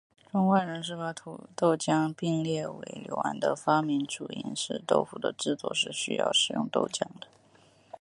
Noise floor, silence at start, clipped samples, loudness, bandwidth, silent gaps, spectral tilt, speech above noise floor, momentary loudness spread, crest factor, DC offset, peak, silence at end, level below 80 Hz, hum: -61 dBFS; 0.35 s; under 0.1%; -29 LUFS; 11.5 kHz; none; -4 dB/octave; 31 dB; 12 LU; 22 dB; under 0.1%; -8 dBFS; 0.75 s; -74 dBFS; none